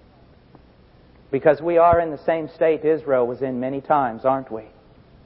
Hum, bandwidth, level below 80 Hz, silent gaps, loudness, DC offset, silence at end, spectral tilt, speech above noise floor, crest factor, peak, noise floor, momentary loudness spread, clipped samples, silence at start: none; 5.6 kHz; -50 dBFS; none; -20 LUFS; under 0.1%; 0.6 s; -11.5 dB/octave; 31 dB; 18 dB; -4 dBFS; -51 dBFS; 10 LU; under 0.1%; 1.3 s